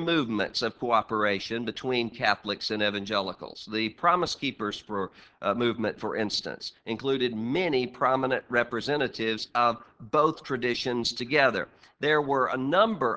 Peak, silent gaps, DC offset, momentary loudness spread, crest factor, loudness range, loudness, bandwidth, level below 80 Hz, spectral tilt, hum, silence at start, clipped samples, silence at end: -6 dBFS; none; under 0.1%; 9 LU; 22 dB; 3 LU; -27 LUFS; 8 kHz; -62 dBFS; -4.5 dB/octave; none; 0 s; under 0.1%; 0 s